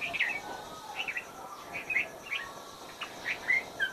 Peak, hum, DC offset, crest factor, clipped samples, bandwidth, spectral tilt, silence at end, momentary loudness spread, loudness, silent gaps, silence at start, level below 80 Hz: -18 dBFS; none; under 0.1%; 18 dB; under 0.1%; 14 kHz; -1.5 dB/octave; 0 s; 15 LU; -33 LUFS; none; 0 s; -68 dBFS